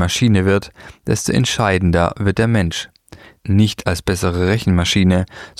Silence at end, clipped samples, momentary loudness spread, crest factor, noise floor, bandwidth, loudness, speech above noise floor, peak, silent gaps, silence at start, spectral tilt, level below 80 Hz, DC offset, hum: 0.1 s; under 0.1%; 8 LU; 16 dB; -43 dBFS; 15 kHz; -16 LUFS; 27 dB; -2 dBFS; none; 0 s; -5.5 dB/octave; -36 dBFS; under 0.1%; none